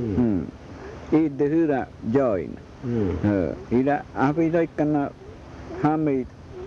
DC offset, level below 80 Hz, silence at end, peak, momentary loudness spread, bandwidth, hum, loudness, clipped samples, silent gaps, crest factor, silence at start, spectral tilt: under 0.1%; -48 dBFS; 0 s; -8 dBFS; 16 LU; 7 kHz; none; -24 LUFS; under 0.1%; none; 16 dB; 0 s; -9 dB/octave